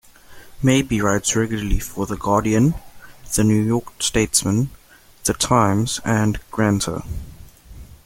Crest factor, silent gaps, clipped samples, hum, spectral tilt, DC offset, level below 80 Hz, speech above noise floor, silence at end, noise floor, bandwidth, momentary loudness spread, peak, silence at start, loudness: 18 dB; none; under 0.1%; none; -4.5 dB/octave; under 0.1%; -34 dBFS; 23 dB; 0.1 s; -42 dBFS; 17 kHz; 9 LU; -2 dBFS; 0.3 s; -20 LUFS